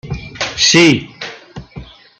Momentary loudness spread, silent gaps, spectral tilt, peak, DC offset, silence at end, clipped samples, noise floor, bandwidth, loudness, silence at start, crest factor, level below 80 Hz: 25 LU; none; -3 dB/octave; 0 dBFS; under 0.1%; 0.35 s; under 0.1%; -35 dBFS; 9 kHz; -11 LUFS; 0.05 s; 16 dB; -40 dBFS